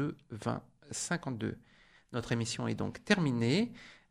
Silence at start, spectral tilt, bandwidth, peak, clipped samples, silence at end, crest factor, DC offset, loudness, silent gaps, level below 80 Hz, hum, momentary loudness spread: 0 s; -5 dB/octave; 13 kHz; -12 dBFS; under 0.1%; 0.15 s; 24 dB; under 0.1%; -35 LUFS; none; -64 dBFS; none; 12 LU